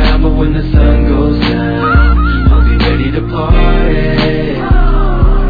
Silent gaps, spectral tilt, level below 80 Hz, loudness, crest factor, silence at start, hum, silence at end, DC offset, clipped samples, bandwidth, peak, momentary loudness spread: none; -9 dB/octave; -10 dBFS; -11 LUFS; 8 dB; 0 s; none; 0 s; under 0.1%; 0.1%; 5 kHz; 0 dBFS; 4 LU